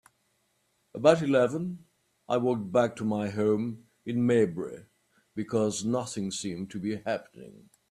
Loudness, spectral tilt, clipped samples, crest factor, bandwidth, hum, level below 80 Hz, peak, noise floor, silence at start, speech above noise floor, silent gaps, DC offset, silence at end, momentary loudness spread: -28 LUFS; -6 dB/octave; under 0.1%; 24 dB; 13.5 kHz; none; -68 dBFS; -6 dBFS; -73 dBFS; 0.95 s; 45 dB; none; under 0.1%; 0.35 s; 16 LU